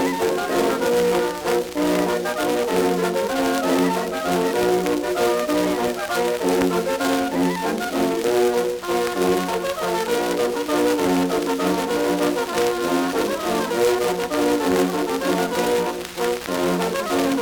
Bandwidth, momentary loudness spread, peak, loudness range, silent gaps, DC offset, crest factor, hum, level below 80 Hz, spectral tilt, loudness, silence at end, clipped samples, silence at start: over 20 kHz; 4 LU; -4 dBFS; 1 LU; none; under 0.1%; 16 dB; none; -52 dBFS; -4.5 dB/octave; -21 LUFS; 0 s; under 0.1%; 0 s